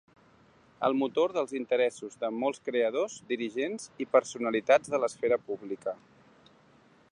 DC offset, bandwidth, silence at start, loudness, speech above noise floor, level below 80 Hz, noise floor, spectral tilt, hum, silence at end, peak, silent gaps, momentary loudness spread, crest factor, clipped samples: under 0.1%; 11 kHz; 0.8 s; -30 LUFS; 32 dB; -76 dBFS; -61 dBFS; -4 dB/octave; none; 1.15 s; -8 dBFS; none; 11 LU; 22 dB; under 0.1%